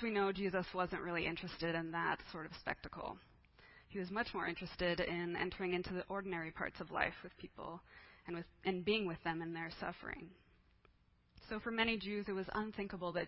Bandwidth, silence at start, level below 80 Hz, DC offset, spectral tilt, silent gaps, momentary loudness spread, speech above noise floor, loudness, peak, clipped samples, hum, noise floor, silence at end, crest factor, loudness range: 5.6 kHz; 0 s; -64 dBFS; under 0.1%; -3 dB/octave; none; 13 LU; 31 dB; -41 LUFS; -18 dBFS; under 0.1%; none; -72 dBFS; 0 s; 24 dB; 3 LU